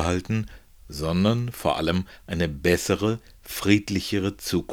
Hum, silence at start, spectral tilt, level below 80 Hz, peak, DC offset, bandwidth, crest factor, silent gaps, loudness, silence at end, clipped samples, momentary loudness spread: none; 0 s; -5.5 dB/octave; -44 dBFS; -4 dBFS; under 0.1%; over 20 kHz; 20 dB; none; -25 LUFS; 0 s; under 0.1%; 10 LU